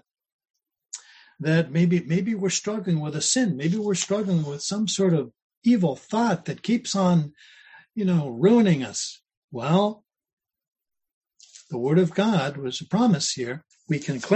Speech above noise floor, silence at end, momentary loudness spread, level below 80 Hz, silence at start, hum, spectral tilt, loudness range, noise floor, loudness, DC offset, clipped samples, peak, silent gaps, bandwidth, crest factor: 29 dB; 0 s; 12 LU; -66 dBFS; 0.95 s; none; -5.5 dB/octave; 3 LU; -52 dBFS; -24 LUFS; under 0.1%; under 0.1%; -6 dBFS; 5.42-5.50 s, 5.57-5.61 s, 9.37-9.48 s, 10.33-10.37 s, 11.14-11.21 s; 9.2 kHz; 18 dB